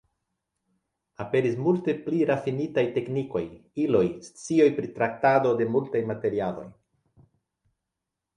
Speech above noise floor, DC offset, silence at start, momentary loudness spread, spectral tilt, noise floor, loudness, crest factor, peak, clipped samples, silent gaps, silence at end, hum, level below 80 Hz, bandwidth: 60 dB; under 0.1%; 1.2 s; 10 LU; -7 dB/octave; -85 dBFS; -26 LUFS; 20 dB; -8 dBFS; under 0.1%; none; 1.65 s; none; -64 dBFS; 10.5 kHz